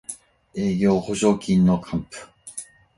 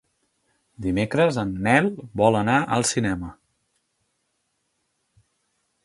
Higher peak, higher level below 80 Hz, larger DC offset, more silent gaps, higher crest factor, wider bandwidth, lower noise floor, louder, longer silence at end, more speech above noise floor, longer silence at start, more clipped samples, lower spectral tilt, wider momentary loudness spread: second, -6 dBFS vs -2 dBFS; about the same, -50 dBFS vs -50 dBFS; neither; neither; second, 16 dB vs 22 dB; about the same, 11.5 kHz vs 11.5 kHz; second, -41 dBFS vs -74 dBFS; about the same, -21 LUFS vs -22 LUFS; second, 0.35 s vs 2.5 s; second, 20 dB vs 52 dB; second, 0.1 s vs 0.8 s; neither; first, -6.5 dB/octave vs -5 dB/octave; first, 19 LU vs 9 LU